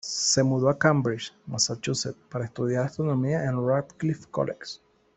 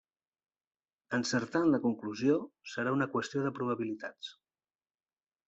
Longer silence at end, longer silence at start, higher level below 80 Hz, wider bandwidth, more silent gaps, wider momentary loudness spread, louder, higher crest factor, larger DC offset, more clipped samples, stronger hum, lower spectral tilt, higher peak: second, 0.4 s vs 1.15 s; second, 0.05 s vs 1.1 s; first, -62 dBFS vs -76 dBFS; about the same, 8.4 kHz vs 8.2 kHz; neither; about the same, 12 LU vs 13 LU; first, -26 LUFS vs -33 LUFS; about the same, 22 dB vs 18 dB; neither; neither; neither; about the same, -4.5 dB/octave vs -5.5 dB/octave; first, -4 dBFS vs -16 dBFS